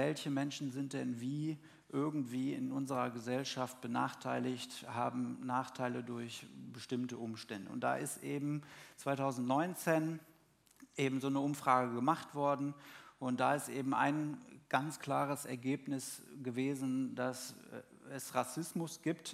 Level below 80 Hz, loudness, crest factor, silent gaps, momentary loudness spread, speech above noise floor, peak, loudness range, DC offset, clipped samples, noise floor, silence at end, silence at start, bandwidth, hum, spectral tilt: -84 dBFS; -38 LUFS; 22 dB; none; 11 LU; 30 dB; -16 dBFS; 5 LU; under 0.1%; under 0.1%; -68 dBFS; 0 s; 0 s; 16 kHz; none; -5.5 dB/octave